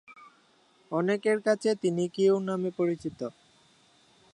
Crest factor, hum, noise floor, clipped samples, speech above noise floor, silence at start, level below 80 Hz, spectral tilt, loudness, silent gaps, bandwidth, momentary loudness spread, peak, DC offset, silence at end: 18 dB; none; -64 dBFS; under 0.1%; 36 dB; 0.1 s; -72 dBFS; -6 dB/octave; -28 LUFS; none; 11 kHz; 10 LU; -12 dBFS; under 0.1%; 1.05 s